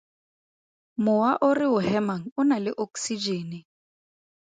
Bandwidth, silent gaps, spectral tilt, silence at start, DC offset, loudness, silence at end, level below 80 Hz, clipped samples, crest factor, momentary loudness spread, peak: 9.4 kHz; 2.32-2.36 s; -5 dB/octave; 1 s; under 0.1%; -25 LUFS; 0.8 s; -70 dBFS; under 0.1%; 18 dB; 11 LU; -10 dBFS